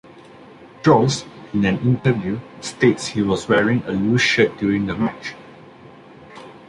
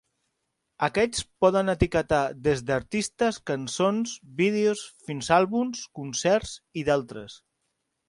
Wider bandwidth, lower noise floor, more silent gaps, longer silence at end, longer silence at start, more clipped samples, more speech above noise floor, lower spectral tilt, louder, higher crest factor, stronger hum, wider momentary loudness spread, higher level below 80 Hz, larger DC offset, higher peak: about the same, 11 kHz vs 11.5 kHz; second, -43 dBFS vs -79 dBFS; neither; second, 0.1 s vs 0.75 s; second, 0.15 s vs 0.8 s; neither; second, 25 dB vs 53 dB; about the same, -5.5 dB/octave vs -4.5 dB/octave; first, -19 LUFS vs -26 LUFS; about the same, 18 dB vs 20 dB; neither; first, 16 LU vs 12 LU; about the same, -50 dBFS vs -46 dBFS; neither; first, -2 dBFS vs -6 dBFS